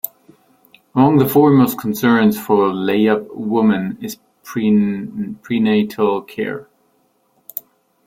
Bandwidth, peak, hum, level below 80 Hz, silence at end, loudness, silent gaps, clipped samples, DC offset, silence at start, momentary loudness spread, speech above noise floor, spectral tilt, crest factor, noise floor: 16.5 kHz; -2 dBFS; none; -56 dBFS; 1.45 s; -16 LUFS; none; under 0.1%; under 0.1%; 0.05 s; 18 LU; 45 dB; -7 dB/octave; 16 dB; -61 dBFS